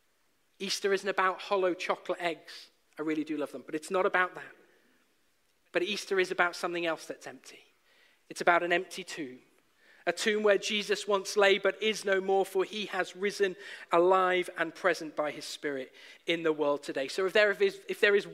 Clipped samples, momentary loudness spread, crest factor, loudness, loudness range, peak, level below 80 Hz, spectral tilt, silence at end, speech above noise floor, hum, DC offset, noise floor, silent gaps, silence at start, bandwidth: under 0.1%; 14 LU; 22 dB; -30 LUFS; 5 LU; -10 dBFS; -84 dBFS; -3 dB/octave; 0 s; 44 dB; none; under 0.1%; -74 dBFS; none; 0.6 s; 15.5 kHz